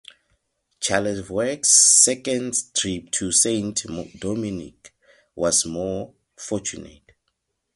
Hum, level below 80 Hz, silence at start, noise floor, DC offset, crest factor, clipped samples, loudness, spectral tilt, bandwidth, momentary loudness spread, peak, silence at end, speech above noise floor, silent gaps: none; -54 dBFS; 0.8 s; -75 dBFS; under 0.1%; 24 dB; under 0.1%; -19 LUFS; -2 dB/octave; 12 kHz; 19 LU; 0 dBFS; 0.85 s; 53 dB; none